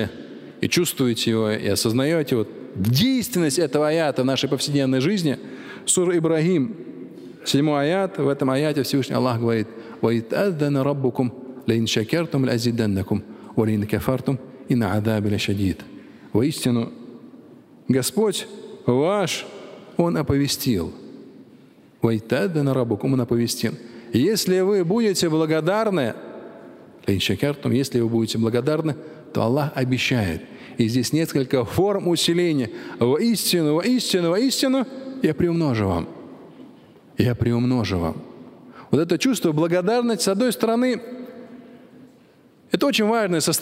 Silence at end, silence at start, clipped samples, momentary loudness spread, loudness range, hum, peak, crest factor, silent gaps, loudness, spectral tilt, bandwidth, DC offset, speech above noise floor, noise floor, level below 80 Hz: 0 s; 0 s; under 0.1%; 11 LU; 3 LU; none; -2 dBFS; 20 dB; none; -22 LUFS; -5 dB/octave; 16 kHz; under 0.1%; 32 dB; -53 dBFS; -54 dBFS